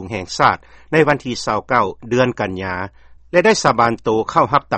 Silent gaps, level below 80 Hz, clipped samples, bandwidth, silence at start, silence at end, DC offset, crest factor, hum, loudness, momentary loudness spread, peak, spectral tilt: none; -46 dBFS; under 0.1%; 8.8 kHz; 0 s; 0 s; under 0.1%; 18 dB; none; -17 LUFS; 11 LU; 0 dBFS; -5 dB/octave